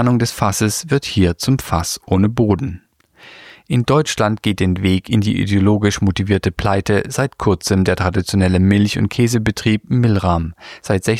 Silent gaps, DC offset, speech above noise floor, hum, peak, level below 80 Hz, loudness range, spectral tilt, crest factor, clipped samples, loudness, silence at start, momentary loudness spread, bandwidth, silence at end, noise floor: none; under 0.1%; 29 dB; none; -2 dBFS; -38 dBFS; 2 LU; -5.5 dB/octave; 16 dB; under 0.1%; -17 LUFS; 0 s; 5 LU; 15.5 kHz; 0 s; -45 dBFS